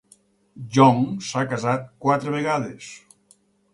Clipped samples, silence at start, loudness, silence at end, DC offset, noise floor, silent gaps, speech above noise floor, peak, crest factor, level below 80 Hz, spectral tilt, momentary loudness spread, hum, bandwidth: under 0.1%; 0.55 s; -21 LUFS; 0.75 s; under 0.1%; -60 dBFS; none; 38 dB; -2 dBFS; 20 dB; -64 dBFS; -6 dB/octave; 20 LU; none; 11.5 kHz